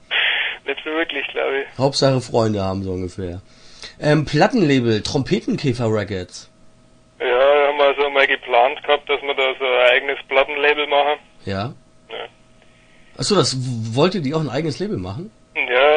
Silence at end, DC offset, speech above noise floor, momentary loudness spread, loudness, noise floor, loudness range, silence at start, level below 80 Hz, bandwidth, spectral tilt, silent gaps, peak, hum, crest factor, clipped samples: 0 s; under 0.1%; 32 dB; 15 LU; -18 LUFS; -51 dBFS; 5 LU; 0.1 s; -50 dBFS; 10.5 kHz; -5 dB/octave; none; 0 dBFS; none; 18 dB; under 0.1%